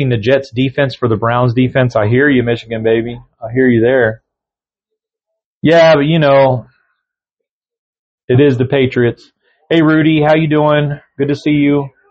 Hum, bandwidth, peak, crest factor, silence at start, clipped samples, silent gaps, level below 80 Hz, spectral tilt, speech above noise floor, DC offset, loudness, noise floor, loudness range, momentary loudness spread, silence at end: none; 7.4 kHz; 0 dBFS; 12 dB; 0 s; under 0.1%; 5.45-5.61 s, 7.51-7.61 s, 7.78-7.93 s, 7.99-8.18 s, 8.24-8.28 s; -46 dBFS; -8 dB/octave; 76 dB; under 0.1%; -12 LUFS; -87 dBFS; 3 LU; 8 LU; 0.25 s